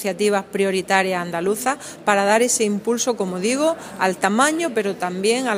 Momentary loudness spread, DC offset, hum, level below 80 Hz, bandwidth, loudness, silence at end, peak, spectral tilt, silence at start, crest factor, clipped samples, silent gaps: 6 LU; under 0.1%; none; -64 dBFS; 15.5 kHz; -20 LUFS; 0 s; 0 dBFS; -3.5 dB/octave; 0 s; 20 dB; under 0.1%; none